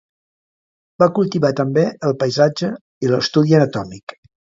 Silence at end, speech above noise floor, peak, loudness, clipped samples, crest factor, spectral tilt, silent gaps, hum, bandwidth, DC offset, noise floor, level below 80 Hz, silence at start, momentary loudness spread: 0.5 s; over 74 dB; 0 dBFS; -17 LUFS; under 0.1%; 18 dB; -6.5 dB/octave; 2.81-3.01 s, 4.03-4.07 s; none; 7.8 kHz; under 0.1%; under -90 dBFS; -58 dBFS; 1 s; 12 LU